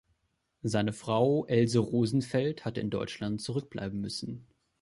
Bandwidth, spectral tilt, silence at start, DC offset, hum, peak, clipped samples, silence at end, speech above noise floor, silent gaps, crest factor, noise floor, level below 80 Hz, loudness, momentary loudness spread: 11.5 kHz; -6.5 dB/octave; 0.65 s; under 0.1%; none; -12 dBFS; under 0.1%; 0.4 s; 47 dB; none; 18 dB; -77 dBFS; -60 dBFS; -31 LUFS; 11 LU